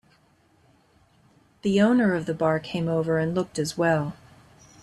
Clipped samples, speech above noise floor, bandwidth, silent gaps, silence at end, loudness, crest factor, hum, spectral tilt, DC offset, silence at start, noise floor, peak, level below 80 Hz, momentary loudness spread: under 0.1%; 38 dB; 12.5 kHz; none; 0.7 s; -24 LUFS; 18 dB; none; -6.5 dB/octave; under 0.1%; 1.65 s; -62 dBFS; -8 dBFS; -60 dBFS; 8 LU